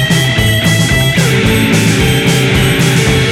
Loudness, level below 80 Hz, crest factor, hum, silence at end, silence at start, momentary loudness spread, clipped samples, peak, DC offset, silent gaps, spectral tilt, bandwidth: -10 LUFS; -26 dBFS; 10 dB; none; 0 s; 0 s; 1 LU; under 0.1%; 0 dBFS; 0.1%; none; -4.5 dB/octave; 16.5 kHz